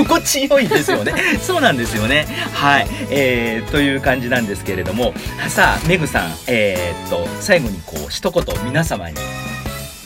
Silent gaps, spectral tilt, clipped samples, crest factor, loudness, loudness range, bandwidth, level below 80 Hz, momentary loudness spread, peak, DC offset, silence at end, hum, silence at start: none; -4 dB/octave; under 0.1%; 18 dB; -17 LUFS; 4 LU; 16.5 kHz; -34 dBFS; 10 LU; 0 dBFS; under 0.1%; 0 s; none; 0 s